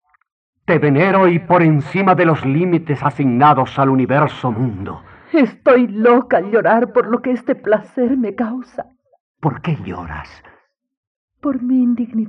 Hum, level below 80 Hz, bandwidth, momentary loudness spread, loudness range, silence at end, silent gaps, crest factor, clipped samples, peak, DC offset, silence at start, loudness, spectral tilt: none; -52 dBFS; 6 kHz; 14 LU; 9 LU; 0 s; 9.20-9.34 s, 10.97-11.28 s; 14 dB; under 0.1%; -2 dBFS; under 0.1%; 0.7 s; -15 LUFS; -9.5 dB/octave